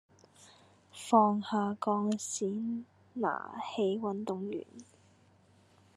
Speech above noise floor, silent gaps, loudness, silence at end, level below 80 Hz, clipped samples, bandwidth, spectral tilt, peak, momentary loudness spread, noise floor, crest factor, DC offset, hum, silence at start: 32 dB; none; -33 LUFS; 1.15 s; -88 dBFS; under 0.1%; 12.5 kHz; -5 dB/octave; -12 dBFS; 16 LU; -64 dBFS; 22 dB; under 0.1%; none; 0.4 s